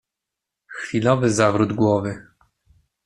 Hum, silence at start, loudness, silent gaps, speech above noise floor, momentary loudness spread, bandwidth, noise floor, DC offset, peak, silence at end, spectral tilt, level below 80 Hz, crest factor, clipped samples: none; 0.7 s; -20 LUFS; none; 65 dB; 17 LU; 11.5 kHz; -84 dBFS; under 0.1%; -2 dBFS; 0.85 s; -6 dB/octave; -56 dBFS; 20 dB; under 0.1%